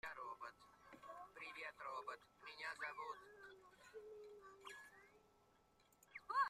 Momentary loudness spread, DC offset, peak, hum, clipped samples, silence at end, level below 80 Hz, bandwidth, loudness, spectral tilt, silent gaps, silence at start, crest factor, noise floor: 14 LU; under 0.1%; -30 dBFS; none; under 0.1%; 0 s; -84 dBFS; 15 kHz; -54 LUFS; -2 dB/octave; none; 0.05 s; 24 dB; -76 dBFS